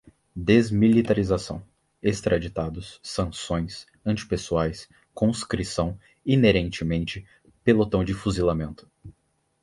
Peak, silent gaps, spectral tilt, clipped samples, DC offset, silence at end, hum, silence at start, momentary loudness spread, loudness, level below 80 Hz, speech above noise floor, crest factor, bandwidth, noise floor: -4 dBFS; none; -6.5 dB/octave; under 0.1%; under 0.1%; 0.55 s; none; 0.35 s; 16 LU; -25 LUFS; -42 dBFS; 46 dB; 20 dB; 11.5 kHz; -69 dBFS